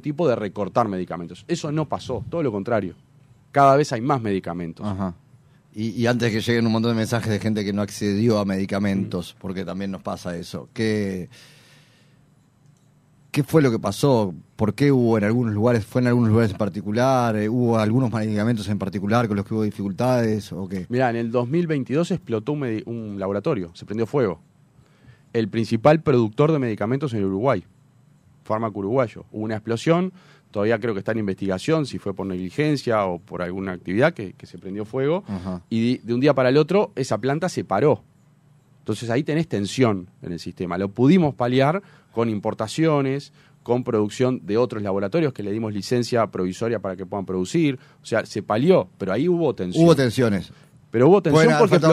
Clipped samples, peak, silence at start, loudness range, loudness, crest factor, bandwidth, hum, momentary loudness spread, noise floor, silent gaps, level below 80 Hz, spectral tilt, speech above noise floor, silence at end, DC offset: under 0.1%; -2 dBFS; 0.05 s; 5 LU; -22 LUFS; 20 dB; 15 kHz; none; 12 LU; -57 dBFS; none; -58 dBFS; -7 dB/octave; 36 dB; 0 s; under 0.1%